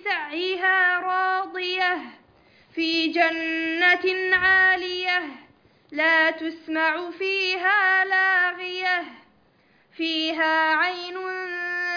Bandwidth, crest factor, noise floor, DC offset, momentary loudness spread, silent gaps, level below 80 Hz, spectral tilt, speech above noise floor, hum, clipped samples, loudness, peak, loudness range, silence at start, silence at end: 5.4 kHz; 18 dB; -60 dBFS; under 0.1%; 11 LU; none; -64 dBFS; -2.5 dB/octave; 38 dB; none; under 0.1%; -21 LUFS; -6 dBFS; 3 LU; 0.05 s; 0 s